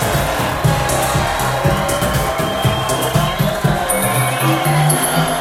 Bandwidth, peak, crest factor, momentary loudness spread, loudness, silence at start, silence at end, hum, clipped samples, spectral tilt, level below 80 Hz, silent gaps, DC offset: 16.5 kHz; -2 dBFS; 14 dB; 3 LU; -16 LUFS; 0 s; 0 s; none; under 0.1%; -4.5 dB/octave; -30 dBFS; none; under 0.1%